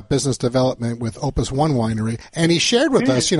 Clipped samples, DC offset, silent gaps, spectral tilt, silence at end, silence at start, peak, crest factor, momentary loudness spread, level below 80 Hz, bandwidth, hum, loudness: under 0.1%; under 0.1%; none; -4.5 dB/octave; 0 s; 0 s; -4 dBFS; 14 dB; 9 LU; -38 dBFS; 11.5 kHz; none; -19 LUFS